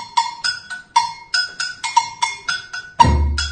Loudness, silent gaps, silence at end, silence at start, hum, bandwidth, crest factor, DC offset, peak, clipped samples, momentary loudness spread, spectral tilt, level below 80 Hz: -19 LUFS; none; 0 s; 0 s; none; 10 kHz; 20 dB; under 0.1%; 0 dBFS; under 0.1%; 9 LU; -3 dB/octave; -28 dBFS